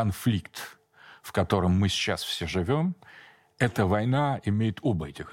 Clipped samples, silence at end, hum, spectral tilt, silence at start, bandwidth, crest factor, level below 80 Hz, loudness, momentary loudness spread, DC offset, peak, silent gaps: under 0.1%; 0 s; none; -6 dB/octave; 0 s; 17 kHz; 18 dB; -50 dBFS; -27 LUFS; 13 LU; under 0.1%; -10 dBFS; none